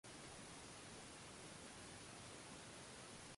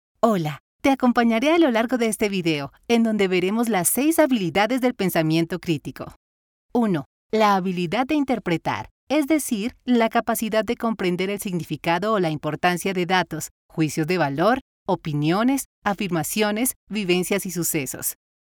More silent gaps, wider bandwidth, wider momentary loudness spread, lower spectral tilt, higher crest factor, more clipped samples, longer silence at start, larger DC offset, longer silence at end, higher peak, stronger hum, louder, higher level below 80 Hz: second, none vs 0.60-0.79 s, 6.16-6.69 s, 7.06-7.30 s, 8.91-9.07 s, 13.51-13.69 s, 14.61-14.86 s, 15.65-15.82 s, 16.76-16.87 s; second, 11.5 kHz vs 20 kHz; second, 0 LU vs 8 LU; second, -2.5 dB/octave vs -4.5 dB/octave; about the same, 14 dB vs 16 dB; neither; second, 0.05 s vs 0.25 s; neither; second, 0 s vs 0.4 s; second, -44 dBFS vs -6 dBFS; neither; second, -56 LUFS vs -22 LUFS; second, -74 dBFS vs -56 dBFS